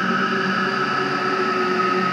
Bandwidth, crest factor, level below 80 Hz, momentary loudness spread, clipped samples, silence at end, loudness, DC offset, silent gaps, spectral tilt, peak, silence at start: 12.5 kHz; 12 dB; -68 dBFS; 1 LU; under 0.1%; 0 s; -20 LUFS; under 0.1%; none; -5 dB/octave; -8 dBFS; 0 s